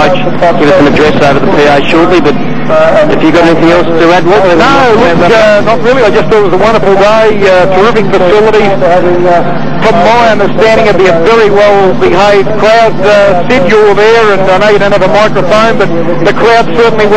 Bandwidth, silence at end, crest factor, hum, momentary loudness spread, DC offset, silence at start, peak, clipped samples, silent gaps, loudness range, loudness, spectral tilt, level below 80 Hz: 9.6 kHz; 0 s; 6 dB; none; 3 LU; 20%; 0 s; 0 dBFS; 2%; none; 1 LU; -5 LUFS; -6 dB/octave; -30 dBFS